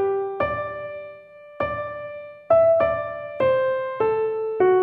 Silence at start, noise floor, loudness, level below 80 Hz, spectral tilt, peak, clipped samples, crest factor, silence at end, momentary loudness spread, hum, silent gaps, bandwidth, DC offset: 0 s; -44 dBFS; -23 LUFS; -54 dBFS; -9.5 dB/octave; -6 dBFS; under 0.1%; 16 dB; 0 s; 16 LU; none; none; 4.5 kHz; under 0.1%